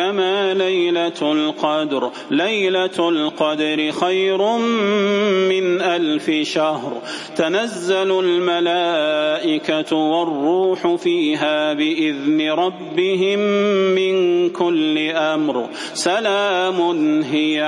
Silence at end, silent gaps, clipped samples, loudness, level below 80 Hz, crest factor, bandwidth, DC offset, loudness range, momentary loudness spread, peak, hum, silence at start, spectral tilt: 0 s; none; under 0.1%; -18 LUFS; -70 dBFS; 14 dB; 11.5 kHz; under 0.1%; 1 LU; 4 LU; -4 dBFS; none; 0 s; -4.5 dB/octave